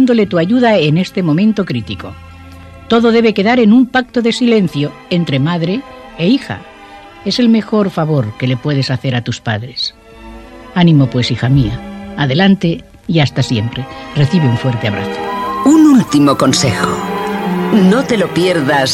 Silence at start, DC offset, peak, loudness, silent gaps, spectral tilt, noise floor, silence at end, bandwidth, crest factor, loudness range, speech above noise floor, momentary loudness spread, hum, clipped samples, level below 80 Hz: 0 s; under 0.1%; 0 dBFS; -13 LUFS; none; -6 dB/octave; -35 dBFS; 0 s; 16 kHz; 12 dB; 4 LU; 23 dB; 10 LU; none; under 0.1%; -40 dBFS